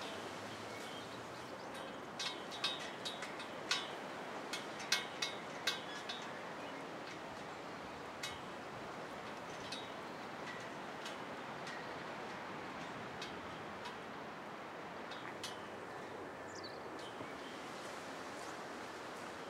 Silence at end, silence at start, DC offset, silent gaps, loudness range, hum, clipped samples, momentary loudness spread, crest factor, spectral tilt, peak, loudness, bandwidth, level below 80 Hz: 0 s; 0 s; under 0.1%; none; 6 LU; none; under 0.1%; 8 LU; 28 dB; -2.5 dB/octave; -18 dBFS; -45 LUFS; 16 kHz; -78 dBFS